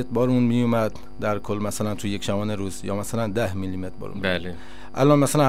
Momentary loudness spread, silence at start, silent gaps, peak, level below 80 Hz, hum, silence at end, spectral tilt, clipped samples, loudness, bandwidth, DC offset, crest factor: 12 LU; 0 s; none; -4 dBFS; -48 dBFS; none; 0 s; -6 dB/octave; under 0.1%; -24 LUFS; 16 kHz; 3%; 18 dB